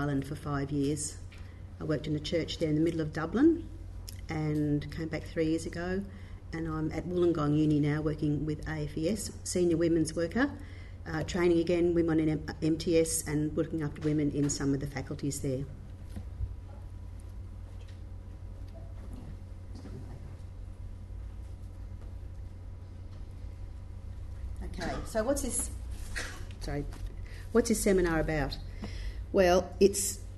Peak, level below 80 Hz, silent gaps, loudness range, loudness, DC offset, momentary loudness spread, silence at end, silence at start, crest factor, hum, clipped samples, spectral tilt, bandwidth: -12 dBFS; -44 dBFS; none; 16 LU; -31 LUFS; under 0.1%; 19 LU; 0 s; 0 s; 20 dB; none; under 0.1%; -5.5 dB/octave; 12 kHz